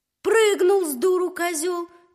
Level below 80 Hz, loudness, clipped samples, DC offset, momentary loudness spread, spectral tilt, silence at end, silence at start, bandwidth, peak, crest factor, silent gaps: -74 dBFS; -21 LUFS; under 0.1%; under 0.1%; 8 LU; -1.5 dB/octave; 0.3 s; 0.25 s; 15.5 kHz; -8 dBFS; 14 dB; none